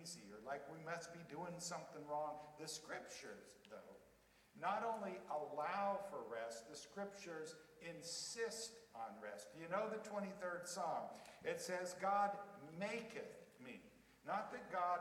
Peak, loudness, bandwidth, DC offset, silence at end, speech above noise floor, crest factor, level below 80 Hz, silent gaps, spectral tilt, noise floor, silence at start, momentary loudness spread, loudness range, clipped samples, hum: -28 dBFS; -47 LUFS; 17 kHz; under 0.1%; 0 s; 25 dB; 20 dB; -84 dBFS; none; -3 dB/octave; -72 dBFS; 0 s; 15 LU; 5 LU; under 0.1%; none